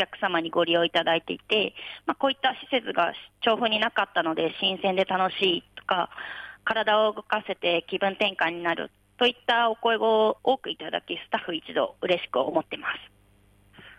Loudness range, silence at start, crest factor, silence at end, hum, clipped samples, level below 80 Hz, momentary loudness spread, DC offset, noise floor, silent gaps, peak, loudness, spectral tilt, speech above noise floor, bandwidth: 2 LU; 0 s; 16 dB; 0.05 s; none; under 0.1%; -68 dBFS; 9 LU; under 0.1%; -60 dBFS; none; -10 dBFS; -26 LUFS; -5.5 dB/octave; 34 dB; 11.5 kHz